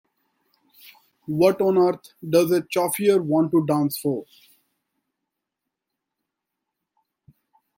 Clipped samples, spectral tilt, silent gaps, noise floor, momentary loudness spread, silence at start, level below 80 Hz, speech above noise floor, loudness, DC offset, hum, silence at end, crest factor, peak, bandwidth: under 0.1%; -6 dB/octave; none; -84 dBFS; 11 LU; 1.3 s; -68 dBFS; 63 dB; -21 LUFS; under 0.1%; none; 3.55 s; 20 dB; -6 dBFS; 16.5 kHz